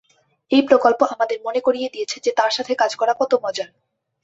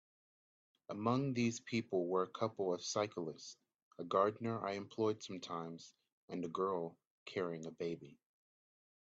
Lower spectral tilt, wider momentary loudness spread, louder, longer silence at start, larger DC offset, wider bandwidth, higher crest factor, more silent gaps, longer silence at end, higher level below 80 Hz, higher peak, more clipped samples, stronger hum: second, -2.5 dB/octave vs -5.5 dB/octave; second, 10 LU vs 14 LU; first, -19 LUFS vs -40 LUFS; second, 0.5 s vs 0.9 s; neither; about the same, 8 kHz vs 8 kHz; about the same, 18 dB vs 22 dB; second, none vs 3.82-3.91 s, 6.12-6.28 s, 7.07-7.26 s; second, 0.6 s vs 0.95 s; first, -68 dBFS vs -82 dBFS; first, -2 dBFS vs -20 dBFS; neither; neither